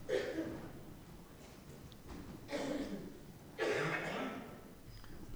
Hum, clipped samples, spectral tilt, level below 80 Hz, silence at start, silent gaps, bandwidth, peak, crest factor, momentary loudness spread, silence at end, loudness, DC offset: none; under 0.1%; -5 dB/octave; -60 dBFS; 0 s; none; over 20 kHz; -24 dBFS; 20 dB; 18 LU; 0 s; -42 LUFS; under 0.1%